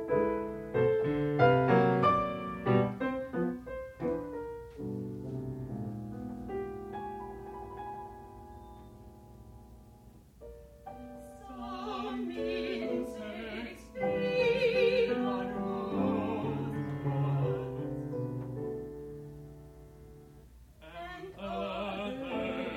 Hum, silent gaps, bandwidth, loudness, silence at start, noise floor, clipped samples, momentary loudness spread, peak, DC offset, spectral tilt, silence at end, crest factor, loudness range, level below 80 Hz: none; none; 15.5 kHz; -33 LUFS; 0 s; -56 dBFS; under 0.1%; 23 LU; -12 dBFS; under 0.1%; -8 dB/octave; 0 s; 22 dB; 17 LU; -56 dBFS